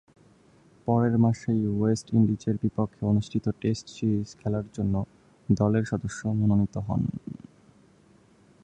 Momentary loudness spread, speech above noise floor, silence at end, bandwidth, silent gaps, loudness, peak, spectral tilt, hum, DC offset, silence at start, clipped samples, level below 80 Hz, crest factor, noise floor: 8 LU; 33 dB; 1.3 s; 9.4 kHz; none; -27 LUFS; -8 dBFS; -8 dB/octave; none; under 0.1%; 0.85 s; under 0.1%; -50 dBFS; 18 dB; -58 dBFS